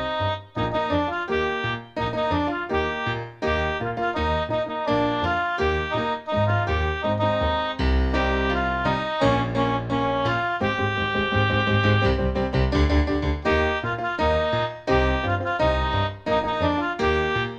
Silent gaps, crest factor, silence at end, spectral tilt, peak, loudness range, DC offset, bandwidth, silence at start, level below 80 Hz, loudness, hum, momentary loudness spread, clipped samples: none; 16 dB; 0 s; -7 dB/octave; -6 dBFS; 3 LU; under 0.1%; 8.2 kHz; 0 s; -32 dBFS; -23 LUFS; none; 5 LU; under 0.1%